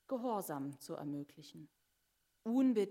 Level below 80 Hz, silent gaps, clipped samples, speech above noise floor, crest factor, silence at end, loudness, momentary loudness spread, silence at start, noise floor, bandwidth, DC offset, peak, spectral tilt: -88 dBFS; none; under 0.1%; 43 dB; 16 dB; 0 s; -39 LUFS; 22 LU; 0.1 s; -81 dBFS; 16 kHz; under 0.1%; -24 dBFS; -6.5 dB/octave